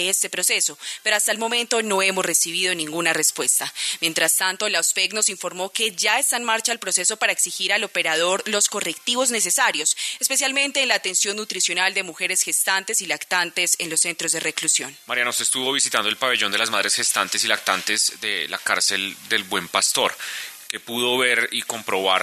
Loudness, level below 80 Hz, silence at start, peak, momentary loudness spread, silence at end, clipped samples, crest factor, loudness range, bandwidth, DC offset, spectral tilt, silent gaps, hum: -20 LUFS; -76 dBFS; 0 s; -2 dBFS; 5 LU; 0 s; under 0.1%; 22 dB; 1 LU; 14 kHz; under 0.1%; 0 dB/octave; none; none